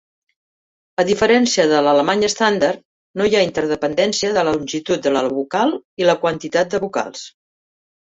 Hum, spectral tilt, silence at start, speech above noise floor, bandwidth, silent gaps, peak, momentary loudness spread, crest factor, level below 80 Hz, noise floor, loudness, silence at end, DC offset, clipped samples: none; -3.5 dB/octave; 1 s; over 73 dB; 8.2 kHz; 2.85-3.14 s, 5.85-5.97 s; -2 dBFS; 10 LU; 16 dB; -54 dBFS; under -90 dBFS; -17 LUFS; 0.8 s; under 0.1%; under 0.1%